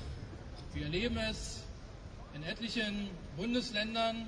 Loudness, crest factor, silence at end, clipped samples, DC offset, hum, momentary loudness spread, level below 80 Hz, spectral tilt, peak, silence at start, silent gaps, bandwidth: -37 LUFS; 18 dB; 0 s; under 0.1%; under 0.1%; none; 15 LU; -50 dBFS; -4.5 dB/octave; -20 dBFS; 0 s; none; 10.5 kHz